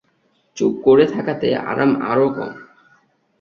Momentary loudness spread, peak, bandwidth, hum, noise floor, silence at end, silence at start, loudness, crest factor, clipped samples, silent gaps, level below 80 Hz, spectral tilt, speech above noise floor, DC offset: 13 LU; -2 dBFS; 7 kHz; none; -63 dBFS; 0.75 s; 0.55 s; -17 LUFS; 16 dB; under 0.1%; none; -58 dBFS; -6.5 dB/octave; 46 dB; under 0.1%